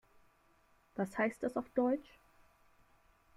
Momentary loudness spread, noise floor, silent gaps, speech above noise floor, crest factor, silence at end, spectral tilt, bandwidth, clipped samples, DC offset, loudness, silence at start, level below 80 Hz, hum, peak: 7 LU; -70 dBFS; none; 34 dB; 20 dB; 1.35 s; -7 dB/octave; 13.5 kHz; under 0.1%; under 0.1%; -37 LUFS; 0.95 s; -72 dBFS; none; -20 dBFS